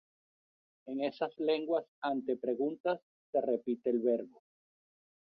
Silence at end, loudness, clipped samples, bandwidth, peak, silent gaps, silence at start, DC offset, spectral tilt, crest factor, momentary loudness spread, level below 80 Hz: 1.1 s; -35 LUFS; under 0.1%; 5.6 kHz; -18 dBFS; 1.88-2.02 s, 2.80-2.84 s, 3.02-3.33 s; 0.85 s; under 0.1%; -8 dB/octave; 18 dB; 6 LU; -84 dBFS